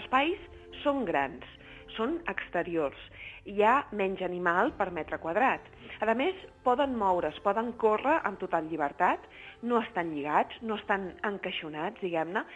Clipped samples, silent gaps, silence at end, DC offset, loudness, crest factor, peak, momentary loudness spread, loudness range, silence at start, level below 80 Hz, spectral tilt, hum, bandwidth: under 0.1%; none; 0 s; under 0.1%; -30 LUFS; 20 dB; -12 dBFS; 10 LU; 3 LU; 0 s; -58 dBFS; -6.5 dB/octave; none; 9.4 kHz